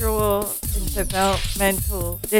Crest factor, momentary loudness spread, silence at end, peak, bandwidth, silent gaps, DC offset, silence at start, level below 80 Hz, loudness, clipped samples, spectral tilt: 18 dB; 5 LU; 0 s; -4 dBFS; over 20 kHz; none; under 0.1%; 0 s; -28 dBFS; -22 LUFS; under 0.1%; -4 dB/octave